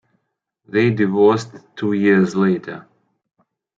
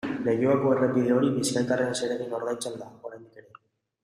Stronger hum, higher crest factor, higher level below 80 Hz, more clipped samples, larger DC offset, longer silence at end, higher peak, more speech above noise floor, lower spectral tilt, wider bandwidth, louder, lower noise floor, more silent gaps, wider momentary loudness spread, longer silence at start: neither; about the same, 18 dB vs 16 dB; about the same, -64 dBFS vs -66 dBFS; neither; neither; first, 0.95 s vs 0.65 s; first, -2 dBFS vs -10 dBFS; first, 57 dB vs 32 dB; first, -7.5 dB/octave vs -5.5 dB/octave; second, 7.8 kHz vs 14.5 kHz; first, -17 LUFS vs -26 LUFS; first, -74 dBFS vs -57 dBFS; neither; about the same, 16 LU vs 17 LU; first, 0.75 s vs 0.05 s